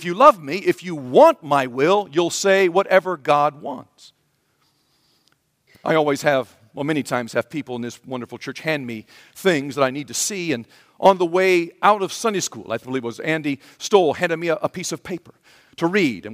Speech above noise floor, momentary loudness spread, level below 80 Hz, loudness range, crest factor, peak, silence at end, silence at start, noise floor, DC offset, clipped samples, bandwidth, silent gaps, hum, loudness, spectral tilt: 46 dB; 15 LU; -68 dBFS; 7 LU; 20 dB; 0 dBFS; 0 s; 0 s; -66 dBFS; under 0.1%; under 0.1%; 16 kHz; none; none; -20 LUFS; -4 dB/octave